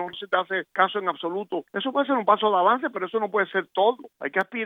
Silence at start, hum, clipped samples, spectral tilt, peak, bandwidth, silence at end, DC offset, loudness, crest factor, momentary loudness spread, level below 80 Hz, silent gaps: 0 s; none; under 0.1%; -6.5 dB/octave; -4 dBFS; 5.8 kHz; 0 s; under 0.1%; -24 LUFS; 20 dB; 9 LU; -82 dBFS; none